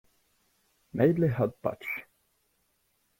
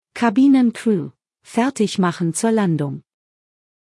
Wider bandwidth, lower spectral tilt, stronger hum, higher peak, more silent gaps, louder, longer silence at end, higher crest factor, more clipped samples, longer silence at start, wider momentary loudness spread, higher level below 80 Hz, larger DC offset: first, 16.5 kHz vs 12 kHz; first, -9.5 dB/octave vs -6 dB/octave; neither; second, -10 dBFS vs -4 dBFS; neither; second, -29 LUFS vs -18 LUFS; first, 1.15 s vs 0.85 s; first, 22 dB vs 16 dB; neither; first, 0.95 s vs 0.15 s; about the same, 13 LU vs 12 LU; about the same, -62 dBFS vs -66 dBFS; neither